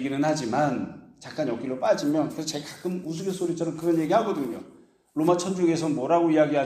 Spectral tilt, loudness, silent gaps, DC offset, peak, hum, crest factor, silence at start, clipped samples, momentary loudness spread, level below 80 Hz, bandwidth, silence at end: -5.5 dB/octave; -26 LUFS; none; under 0.1%; -8 dBFS; none; 16 dB; 0 s; under 0.1%; 10 LU; -68 dBFS; 15 kHz; 0 s